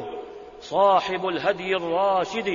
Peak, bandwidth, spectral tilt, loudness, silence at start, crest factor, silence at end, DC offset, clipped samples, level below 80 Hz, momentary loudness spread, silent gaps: -8 dBFS; 7.4 kHz; -4.5 dB/octave; -23 LUFS; 0 s; 16 dB; 0 s; under 0.1%; under 0.1%; -60 dBFS; 18 LU; none